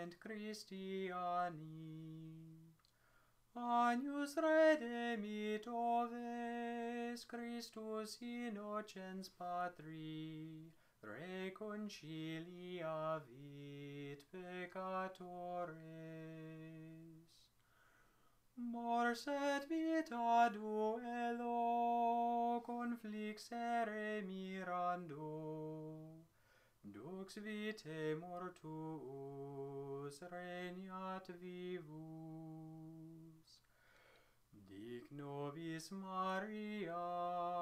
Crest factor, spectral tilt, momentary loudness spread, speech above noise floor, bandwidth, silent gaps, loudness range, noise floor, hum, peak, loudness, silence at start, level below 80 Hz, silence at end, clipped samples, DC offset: 22 dB; -5.5 dB/octave; 17 LU; 31 dB; 15.5 kHz; none; 13 LU; -74 dBFS; none; -22 dBFS; -44 LUFS; 0 s; -82 dBFS; 0 s; under 0.1%; under 0.1%